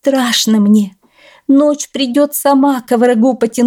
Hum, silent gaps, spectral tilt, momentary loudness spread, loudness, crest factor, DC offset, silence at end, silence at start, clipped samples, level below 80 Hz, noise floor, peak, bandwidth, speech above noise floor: none; none; -4.5 dB/octave; 5 LU; -12 LUFS; 10 dB; under 0.1%; 0 s; 0.05 s; under 0.1%; -62 dBFS; -46 dBFS; -2 dBFS; 18 kHz; 35 dB